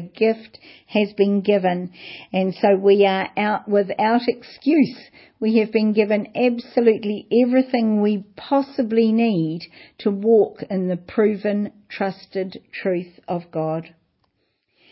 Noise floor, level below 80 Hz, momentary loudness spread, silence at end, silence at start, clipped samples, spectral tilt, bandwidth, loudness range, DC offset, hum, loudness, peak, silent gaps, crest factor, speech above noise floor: -70 dBFS; -68 dBFS; 11 LU; 1.05 s; 0 s; under 0.1%; -11.5 dB/octave; 5.8 kHz; 5 LU; under 0.1%; none; -20 LUFS; -4 dBFS; none; 16 dB; 50 dB